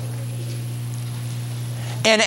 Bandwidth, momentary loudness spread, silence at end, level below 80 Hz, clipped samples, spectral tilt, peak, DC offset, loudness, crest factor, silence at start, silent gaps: 16.5 kHz; 8 LU; 0 s; -54 dBFS; under 0.1%; -4 dB/octave; -2 dBFS; under 0.1%; -26 LUFS; 22 dB; 0 s; none